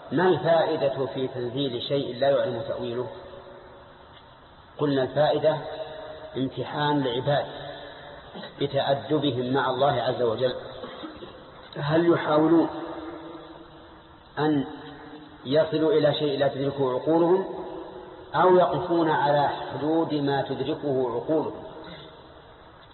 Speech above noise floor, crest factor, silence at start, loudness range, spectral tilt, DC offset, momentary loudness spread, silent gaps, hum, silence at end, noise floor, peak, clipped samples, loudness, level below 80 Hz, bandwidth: 26 dB; 16 dB; 0 s; 5 LU; -10.5 dB/octave; under 0.1%; 20 LU; none; none; 0.1 s; -50 dBFS; -10 dBFS; under 0.1%; -25 LUFS; -60 dBFS; 4.3 kHz